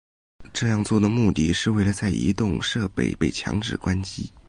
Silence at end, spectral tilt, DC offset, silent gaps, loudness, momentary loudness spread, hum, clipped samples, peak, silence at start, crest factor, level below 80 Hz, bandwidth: 0.1 s; -5.5 dB/octave; under 0.1%; none; -23 LUFS; 6 LU; none; under 0.1%; -8 dBFS; 0.4 s; 16 dB; -40 dBFS; 11.5 kHz